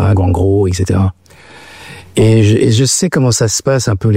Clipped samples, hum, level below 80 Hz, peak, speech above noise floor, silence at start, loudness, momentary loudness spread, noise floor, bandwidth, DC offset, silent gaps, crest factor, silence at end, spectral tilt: under 0.1%; none; -38 dBFS; -2 dBFS; 28 dB; 0 s; -12 LUFS; 8 LU; -38 dBFS; 15.5 kHz; under 0.1%; none; 10 dB; 0 s; -5.5 dB/octave